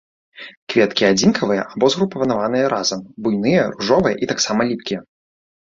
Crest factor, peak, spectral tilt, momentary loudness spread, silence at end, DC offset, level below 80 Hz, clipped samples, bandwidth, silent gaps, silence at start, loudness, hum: 16 dB; -2 dBFS; -4.5 dB/octave; 10 LU; 0.65 s; under 0.1%; -54 dBFS; under 0.1%; 7.6 kHz; 0.57-0.67 s; 0.4 s; -18 LUFS; none